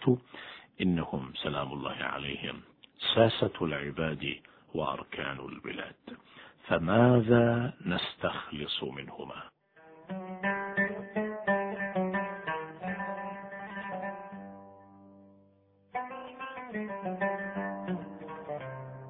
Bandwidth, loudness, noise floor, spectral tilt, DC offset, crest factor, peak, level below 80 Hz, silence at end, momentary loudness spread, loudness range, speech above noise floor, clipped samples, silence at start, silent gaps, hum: 4.7 kHz; -32 LUFS; -65 dBFS; -9.5 dB/octave; under 0.1%; 24 dB; -8 dBFS; -62 dBFS; 0 s; 18 LU; 12 LU; 34 dB; under 0.1%; 0 s; none; none